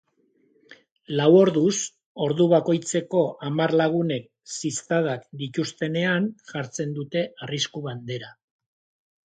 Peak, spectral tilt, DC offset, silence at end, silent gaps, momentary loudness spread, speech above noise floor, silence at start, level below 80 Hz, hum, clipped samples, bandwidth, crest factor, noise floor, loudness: -6 dBFS; -5 dB/octave; under 0.1%; 0.95 s; 0.92-0.96 s, 2.06-2.15 s; 14 LU; 42 dB; 0.7 s; -70 dBFS; none; under 0.1%; 9.4 kHz; 20 dB; -65 dBFS; -24 LUFS